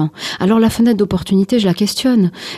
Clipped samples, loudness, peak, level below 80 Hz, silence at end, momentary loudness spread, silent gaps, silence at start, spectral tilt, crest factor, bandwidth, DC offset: under 0.1%; -14 LUFS; -4 dBFS; -42 dBFS; 0 s; 3 LU; none; 0 s; -6 dB/octave; 10 dB; 14.5 kHz; under 0.1%